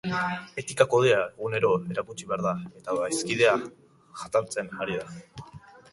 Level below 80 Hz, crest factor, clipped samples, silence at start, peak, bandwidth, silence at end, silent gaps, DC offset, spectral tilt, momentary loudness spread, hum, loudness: -62 dBFS; 20 dB; under 0.1%; 0.05 s; -6 dBFS; 11.5 kHz; 0.35 s; none; under 0.1%; -4.5 dB/octave; 20 LU; none; -27 LUFS